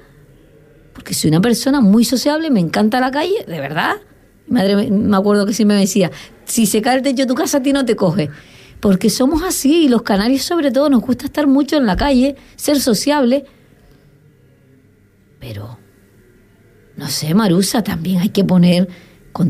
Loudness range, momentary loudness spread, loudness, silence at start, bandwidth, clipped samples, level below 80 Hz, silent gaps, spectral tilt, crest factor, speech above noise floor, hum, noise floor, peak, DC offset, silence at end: 6 LU; 8 LU; -15 LUFS; 0.95 s; 15.5 kHz; under 0.1%; -40 dBFS; none; -5 dB/octave; 12 dB; 36 dB; none; -51 dBFS; -2 dBFS; under 0.1%; 0 s